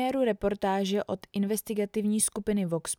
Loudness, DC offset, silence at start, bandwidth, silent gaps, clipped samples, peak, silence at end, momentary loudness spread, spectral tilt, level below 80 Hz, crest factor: -29 LUFS; under 0.1%; 0 s; over 20 kHz; none; under 0.1%; -14 dBFS; 0.05 s; 5 LU; -4.5 dB/octave; -56 dBFS; 16 dB